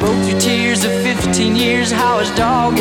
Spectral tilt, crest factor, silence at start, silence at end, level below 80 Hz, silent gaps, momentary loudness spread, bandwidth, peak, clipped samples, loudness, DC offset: -4 dB/octave; 12 dB; 0 s; 0 s; -38 dBFS; none; 2 LU; 18.5 kHz; -2 dBFS; under 0.1%; -14 LUFS; 0.1%